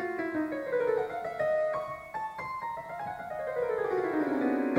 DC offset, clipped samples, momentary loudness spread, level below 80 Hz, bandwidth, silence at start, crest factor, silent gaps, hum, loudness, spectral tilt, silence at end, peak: under 0.1%; under 0.1%; 9 LU; -66 dBFS; 16.5 kHz; 0 s; 20 dB; none; none; -32 LUFS; -7 dB/octave; 0 s; -12 dBFS